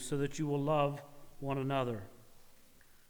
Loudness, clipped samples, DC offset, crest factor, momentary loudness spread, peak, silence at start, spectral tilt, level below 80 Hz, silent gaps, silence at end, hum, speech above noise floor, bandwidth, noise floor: -36 LUFS; under 0.1%; under 0.1%; 18 dB; 15 LU; -18 dBFS; 0 s; -6 dB/octave; -58 dBFS; none; 0.45 s; none; 26 dB; over 20 kHz; -60 dBFS